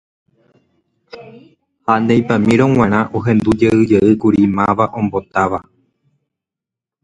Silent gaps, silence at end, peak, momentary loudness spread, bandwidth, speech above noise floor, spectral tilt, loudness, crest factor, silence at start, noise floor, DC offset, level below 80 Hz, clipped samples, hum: none; 1.45 s; 0 dBFS; 6 LU; 10.5 kHz; 72 dB; -8 dB/octave; -14 LUFS; 16 dB; 1.15 s; -86 dBFS; under 0.1%; -44 dBFS; under 0.1%; none